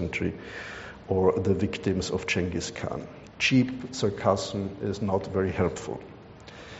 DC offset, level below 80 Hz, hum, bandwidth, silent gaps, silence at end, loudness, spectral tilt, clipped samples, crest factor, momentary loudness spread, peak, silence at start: under 0.1%; -52 dBFS; none; 8 kHz; none; 0 s; -28 LUFS; -5 dB/octave; under 0.1%; 20 dB; 16 LU; -8 dBFS; 0 s